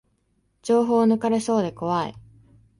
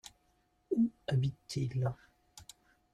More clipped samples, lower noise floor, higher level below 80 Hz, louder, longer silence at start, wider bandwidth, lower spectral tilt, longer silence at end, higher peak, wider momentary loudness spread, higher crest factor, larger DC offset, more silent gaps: neither; second, -68 dBFS vs -74 dBFS; about the same, -60 dBFS vs -64 dBFS; first, -22 LUFS vs -35 LUFS; about the same, 0.65 s vs 0.7 s; second, 11.5 kHz vs 13 kHz; about the same, -6.5 dB/octave vs -7 dB/octave; about the same, 0.6 s vs 0.5 s; first, -8 dBFS vs -22 dBFS; second, 9 LU vs 22 LU; about the same, 16 dB vs 16 dB; neither; neither